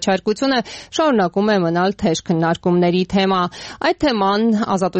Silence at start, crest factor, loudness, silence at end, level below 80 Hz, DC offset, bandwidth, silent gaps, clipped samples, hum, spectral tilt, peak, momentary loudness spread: 0 s; 12 dB; -18 LUFS; 0 s; -48 dBFS; under 0.1%; 8.6 kHz; none; under 0.1%; none; -5.5 dB/octave; -6 dBFS; 4 LU